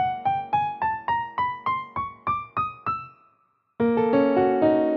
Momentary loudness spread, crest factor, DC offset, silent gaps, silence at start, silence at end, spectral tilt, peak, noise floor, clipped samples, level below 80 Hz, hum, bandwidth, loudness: 10 LU; 16 dB; under 0.1%; none; 0 s; 0 s; -9 dB/octave; -8 dBFS; -66 dBFS; under 0.1%; -58 dBFS; none; 5.8 kHz; -25 LUFS